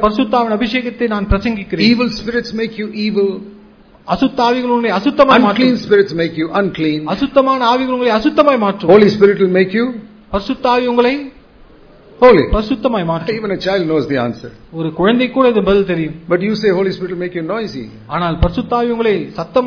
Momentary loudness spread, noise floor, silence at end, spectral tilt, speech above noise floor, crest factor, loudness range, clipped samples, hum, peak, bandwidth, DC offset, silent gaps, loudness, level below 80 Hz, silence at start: 12 LU; -43 dBFS; 0 s; -7 dB/octave; 29 dB; 14 dB; 5 LU; 0.3%; none; 0 dBFS; 5.4 kHz; under 0.1%; none; -14 LUFS; -32 dBFS; 0 s